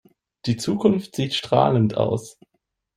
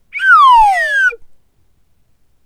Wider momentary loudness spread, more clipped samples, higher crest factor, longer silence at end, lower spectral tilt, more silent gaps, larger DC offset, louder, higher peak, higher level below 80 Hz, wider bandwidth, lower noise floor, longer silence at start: about the same, 9 LU vs 8 LU; neither; first, 20 dB vs 12 dB; second, 0.65 s vs 1.2 s; first, -6.5 dB/octave vs 1.5 dB/octave; neither; second, under 0.1% vs 0.2%; second, -22 LUFS vs -9 LUFS; about the same, -2 dBFS vs 0 dBFS; second, -56 dBFS vs -40 dBFS; about the same, 15 kHz vs 14 kHz; first, -74 dBFS vs -57 dBFS; first, 0.45 s vs 0.15 s